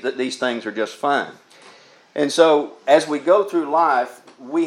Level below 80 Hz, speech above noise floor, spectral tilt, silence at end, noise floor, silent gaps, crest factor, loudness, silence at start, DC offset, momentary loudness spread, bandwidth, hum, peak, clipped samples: -82 dBFS; 29 dB; -3.5 dB/octave; 0 s; -48 dBFS; none; 18 dB; -19 LUFS; 0.05 s; under 0.1%; 10 LU; 13.5 kHz; none; 0 dBFS; under 0.1%